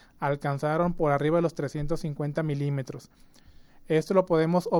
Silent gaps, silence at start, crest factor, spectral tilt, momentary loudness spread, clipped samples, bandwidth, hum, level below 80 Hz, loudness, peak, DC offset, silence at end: none; 0.2 s; 18 dB; -7.5 dB/octave; 8 LU; under 0.1%; 12.5 kHz; none; -46 dBFS; -27 LUFS; -8 dBFS; under 0.1%; 0 s